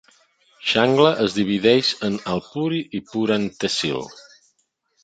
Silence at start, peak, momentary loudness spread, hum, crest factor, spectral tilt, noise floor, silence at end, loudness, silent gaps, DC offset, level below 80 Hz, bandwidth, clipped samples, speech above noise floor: 0.6 s; -2 dBFS; 10 LU; none; 20 dB; -5 dB/octave; -69 dBFS; 0.85 s; -20 LUFS; none; under 0.1%; -58 dBFS; 9.2 kHz; under 0.1%; 49 dB